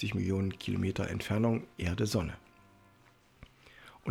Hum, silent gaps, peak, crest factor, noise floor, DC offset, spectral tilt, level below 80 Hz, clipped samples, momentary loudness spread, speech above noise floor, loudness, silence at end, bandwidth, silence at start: none; none; -16 dBFS; 18 dB; -63 dBFS; under 0.1%; -6.5 dB/octave; -54 dBFS; under 0.1%; 15 LU; 31 dB; -33 LUFS; 0 s; 16 kHz; 0 s